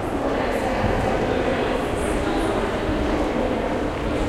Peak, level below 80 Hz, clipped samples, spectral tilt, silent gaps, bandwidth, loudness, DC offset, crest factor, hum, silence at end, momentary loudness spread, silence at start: -8 dBFS; -32 dBFS; under 0.1%; -6 dB/octave; none; 15.5 kHz; -23 LUFS; under 0.1%; 14 dB; none; 0 s; 2 LU; 0 s